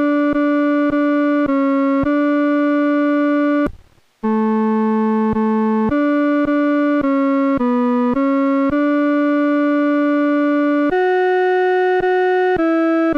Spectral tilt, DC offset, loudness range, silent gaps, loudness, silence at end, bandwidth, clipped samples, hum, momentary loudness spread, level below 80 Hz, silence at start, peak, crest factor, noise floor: -8 dB/octave; under 0.1%; 2 LU; none; -16 LUFS; 0 s; 5.4 kHz; under 0.1%; none; 1 LU; -46 dBFS; 0 s; -10 dBFS; 6 dB; -44 dBFS